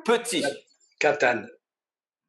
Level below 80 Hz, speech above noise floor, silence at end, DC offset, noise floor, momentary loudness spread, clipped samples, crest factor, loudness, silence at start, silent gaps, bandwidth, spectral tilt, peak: -86 dBFS; over 66 dB; 0.75 s; under 0.1%; under -90 dBFS; 9 LU; under 0.1%; 20 dB; -25 LUFS; 0.05 s; none; 12.5 kHz; -2.5 dB/octave; -6 dBFS